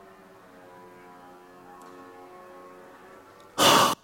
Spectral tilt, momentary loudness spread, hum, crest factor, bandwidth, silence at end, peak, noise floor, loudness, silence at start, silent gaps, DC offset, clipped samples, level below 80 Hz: -2 dB/octave; 30 LU; none; 24 dB; 16.5 kHz; 0.1 s; -6 dBFS; -51 dBFS; -20 LUFS; 3.55 s; none; under 0.1%; under 0.1%; -68 dBFS